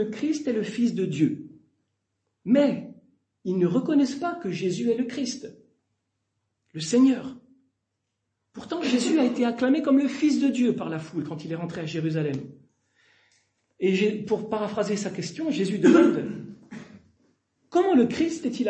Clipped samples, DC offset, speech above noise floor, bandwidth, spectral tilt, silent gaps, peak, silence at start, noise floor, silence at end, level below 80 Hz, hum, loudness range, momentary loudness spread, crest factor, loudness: under 0.1%; under 0.1%; 56 dB; 8.8 kHz; -6 dB/octave; none; -6 dBFS; 0 s; -80 dBFS; 0 s; -70 dBFS; none; 5 LU; 16 LU; 20 dB; -25 LUFS